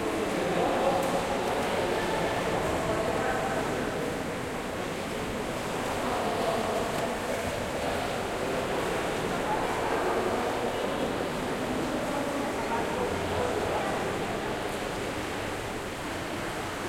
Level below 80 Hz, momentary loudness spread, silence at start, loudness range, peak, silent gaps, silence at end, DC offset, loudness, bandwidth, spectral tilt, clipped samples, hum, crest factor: -48 dBFS; 5 LU; 0 s; 3 LU; -14 dBFS; none; 0 s; under 0.1%; -30 LUFS; 16.5 kHz; -4.5 dB/octave; under 0.1%; none; 16 dB